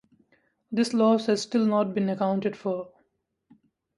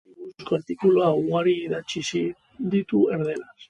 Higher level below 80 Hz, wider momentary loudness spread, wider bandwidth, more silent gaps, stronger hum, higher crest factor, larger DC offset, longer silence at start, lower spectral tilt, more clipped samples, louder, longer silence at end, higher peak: second, -72 dBFS vs -64 dBFS; about the same, 10 LU vs 11 LU; about the same, 11 kHz vs 10 kHz; neither; neither; about the same, 18 dB vs 16 dB; neither; first, 0.7 s vs 0.2 s; about the same, -6 dB/octave vs -6 dB/octave; neither; about the same, -25 LUFS vs -24 LUFS; first, 1.1 s vs 0.05 s; about the same, -10 dBFS vs -8 dBFS